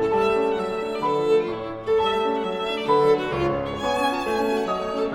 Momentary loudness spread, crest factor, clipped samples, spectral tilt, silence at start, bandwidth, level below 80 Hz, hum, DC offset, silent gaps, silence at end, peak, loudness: 6 LU; 14 dB; under 0.1%; -5.5 dB/octave; 0 s; 13.5 kHz; -50 dBFS; none; under 0.1%; none; 0 s; -8 dBFS; -23 LUFS